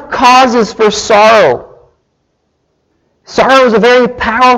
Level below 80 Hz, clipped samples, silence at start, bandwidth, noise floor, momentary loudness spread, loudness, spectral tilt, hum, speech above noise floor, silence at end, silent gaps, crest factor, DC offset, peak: -40 dBFS; 0.1%; 0 s; 13.5 kHz; -61 dBFS; 7 LU; -7 LUFS; -3.5 dB/octave; none; 54 dB; 0 s; none; 8 dB; under 0.1%; 0 dBFS